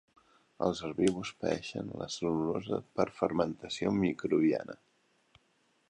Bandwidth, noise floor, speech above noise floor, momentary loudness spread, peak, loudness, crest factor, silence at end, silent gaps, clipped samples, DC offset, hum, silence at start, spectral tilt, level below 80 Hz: 11 kHz; -72 dBFS; 40 dB; 9 LU; -12 dBFS; -33 LUFS; 20 dB; 1.15 s; none; under 0.1%; under 0.1%; none; 0.6 s; -6 dB/octave; -62 dBFS